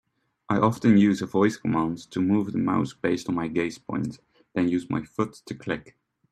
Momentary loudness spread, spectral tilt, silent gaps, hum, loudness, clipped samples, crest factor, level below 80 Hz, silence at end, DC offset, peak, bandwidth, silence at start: 12 LU; -7 dB/octave; none; none; -25 LUFS; under 0.1%; 20 dB; -60 dBFS; 0.5 s; under 0.1%; -6 dBFS; 12.5 kHz; 0.5 s